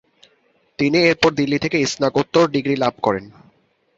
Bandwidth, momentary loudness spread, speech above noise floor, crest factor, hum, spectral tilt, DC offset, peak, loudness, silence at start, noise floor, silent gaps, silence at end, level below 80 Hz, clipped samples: 7.8 kHz; 7 LU; 43 dB; 18 dB; none; -5 dB/octave; under 0.1%; -2 dBFS; -18 LUFS; 0.8 s; -61 dBFS; none; 0.7 s; -54 dBFS; under 0.1%